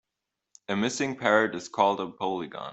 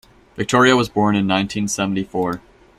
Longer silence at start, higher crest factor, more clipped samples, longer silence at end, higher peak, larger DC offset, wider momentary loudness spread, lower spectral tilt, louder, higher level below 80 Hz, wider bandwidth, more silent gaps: first, 0.7 s vs 0.35 s; about the same, 22 dB vs 18 dB; neither; second, 0 s vs 0.4 s; second, -6 dBFS vs -2 dBFS; neither; about the same, 9 LU vs 11 LU; about the same, -4 dB/octave vs -4.5 dB/octave; second, -27 LUFS vs -18 LUFS; second, -70 dBFS vs -50 dBFS; second, 8.2 kHz vs 14 kHz; neither